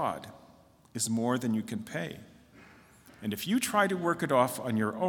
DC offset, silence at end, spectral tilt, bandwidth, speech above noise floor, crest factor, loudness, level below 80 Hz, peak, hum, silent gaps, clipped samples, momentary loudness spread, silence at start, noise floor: under 0.1%; 0 s; -4.5 dB/octave; 18 kHz; 29 dB; 20 dB; -30 LUFS; -70 dBFS; -10 dBFS; none; none; under 0.1%; 14 LU; 0 s; -59 dBFS